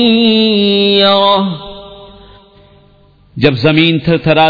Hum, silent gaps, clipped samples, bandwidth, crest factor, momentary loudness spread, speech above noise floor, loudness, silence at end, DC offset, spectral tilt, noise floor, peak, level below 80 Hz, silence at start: none; none; 0.1%; 5.4 kHz; 12 dB; 18 LU; 36 dB; -10 LUFS; 0 s; under 0.1%; -7.5 dB/octave; -46 dBFS; 0 dBFS; -42 dBFS; 0 s